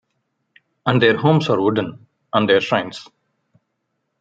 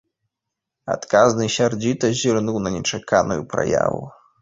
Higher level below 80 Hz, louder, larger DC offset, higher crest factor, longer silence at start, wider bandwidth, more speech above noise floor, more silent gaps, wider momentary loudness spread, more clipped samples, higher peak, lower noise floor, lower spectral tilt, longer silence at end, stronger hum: second, -62 dBFS vs -50 dBFS; about the same, -18 LUFS vs -20 LUFS; neither; about the same, 18 dB vs 20 dB; about the same, 0.85 s vs 0.85 s; about the same, 7.8 kHz vs 8 kHz; second, 57 dB vs 63 dB; neither; first, 14 LU vs 11 LU; neither; about the same, -2 dBFS vs -2 dBFS; second, -74 dBFS vs -83 dBFS; first, -7 dB/octave vs -4.5 dB/octave; first, 1.15 s vs 0.3 s; neither